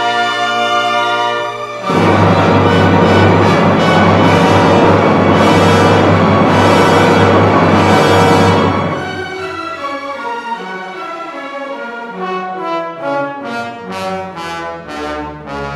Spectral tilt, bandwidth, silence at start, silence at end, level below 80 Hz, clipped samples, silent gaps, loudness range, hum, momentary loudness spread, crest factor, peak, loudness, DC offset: -6 dB/octave; 13.5 kHz; 0 s; 0 s; -44 dBFS; under 0.1%; none; 12 LU; none; 15 LU; 12 dB; 0 dBFS; -11 LUFS; under 0.1%